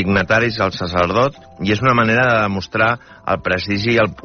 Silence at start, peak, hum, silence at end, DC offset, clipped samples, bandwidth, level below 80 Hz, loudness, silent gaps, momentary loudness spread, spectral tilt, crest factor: 0 s; -2 dBFS; none; 0.05 s; under 0.1%; under 0.1%; 6.6 kHz; -44 dBFS; -17 LUFS; none; 7 LU; -4 dB/octave; 16 dB